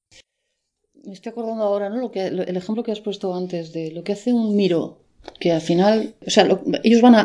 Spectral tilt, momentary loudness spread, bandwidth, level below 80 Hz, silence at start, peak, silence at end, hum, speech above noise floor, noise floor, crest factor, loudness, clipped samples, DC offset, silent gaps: -5.5 dB/octave; 12 LU; 10.5 kHz; -64 dBFS; 1.05 s; 0 dBFS; 0 s; none; 57 dB; -76 dBFS; 20 dB; -20 LUFS; under 0.1%; under 0.1%; none